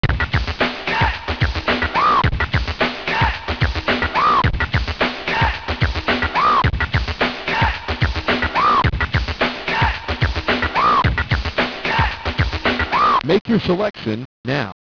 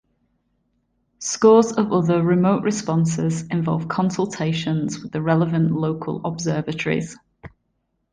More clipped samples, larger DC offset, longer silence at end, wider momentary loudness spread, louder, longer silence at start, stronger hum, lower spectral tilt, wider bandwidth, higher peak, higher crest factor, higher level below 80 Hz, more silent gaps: neither; first, 0.1% vs under 0.1%; second, 0.25 s vs 0.65 s; second, 6 LU vs 10 LU; first, -18 LUFS vs -21 LUFS; second, 0 s vs 1.2 s; neither; about the same, -6 dB/octave vs -6 dB/octave; second, 5.4 kHz vs 9.8 kHz; second, -6 dBFS vs -2 dBFS; about the same, 14 dB vs 18 dB; first, -28 dBFS vs -56 dBFS; first, 13.41-13.45 s, 14.25-14.44 s vs none